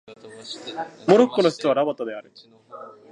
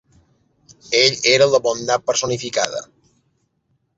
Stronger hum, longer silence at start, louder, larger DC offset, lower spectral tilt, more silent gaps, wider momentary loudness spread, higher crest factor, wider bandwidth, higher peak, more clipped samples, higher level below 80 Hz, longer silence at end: neither; second, 0.1 s vs 0.9 s; second, -21 LUFS vs -17 LUFS; neither; first, -5.5 dB/octave vs -2 dB/octave; neither; first, 24 LU vs 8 LU; about the same, 22 dB vs 20 dB; first, 10.5 kHz vs 8 kHz; about the same, -2 dBFS vs 0 dBFS; neither; second, -76 dBFS vs -60 dBFS; second, 0.2 s vs 1.15 s